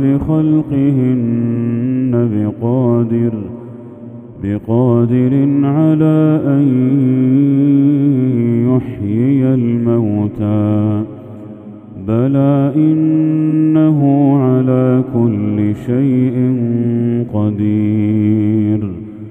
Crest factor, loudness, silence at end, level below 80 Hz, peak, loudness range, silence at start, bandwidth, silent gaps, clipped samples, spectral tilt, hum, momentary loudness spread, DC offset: 12 dB; -13 LUFS; 0 s; -46 dBFS; 0 dBFS; 4 LU; 0 s; 3.7 kHz; none; under 0.1%; -11.5 dB/octave; none; 10 LU; under 0.1%